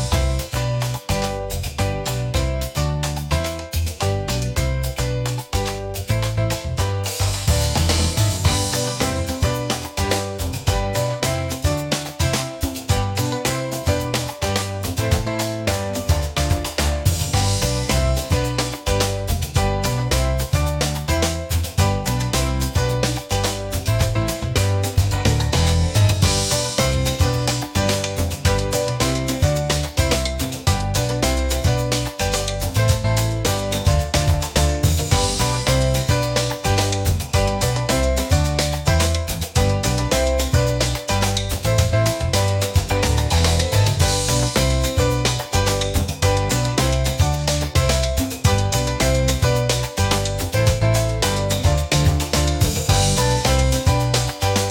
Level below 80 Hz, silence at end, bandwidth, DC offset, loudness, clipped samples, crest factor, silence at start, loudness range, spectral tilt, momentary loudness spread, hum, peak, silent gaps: -28 dBFS; 0 s; 17 kHz; under 0.1%; -20 LUFS; under 0.1%; 16 dB; 0 s; 4 LU; -4.5 dB/octave; 5 LU; none; -2 dBFS; none